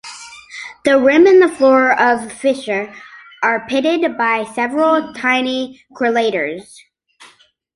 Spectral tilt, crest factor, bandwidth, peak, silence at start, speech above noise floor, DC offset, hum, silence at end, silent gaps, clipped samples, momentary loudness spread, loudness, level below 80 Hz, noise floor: -4 dB/octave; 14 dB; 11.5 kHz; -2 dBFS; 0.05 s; 35 dB; under 0.1%; none; 1.15 s; none; under 0.1%; 20 LU; -15 LUFS; -60 dBFS; -50 dBFS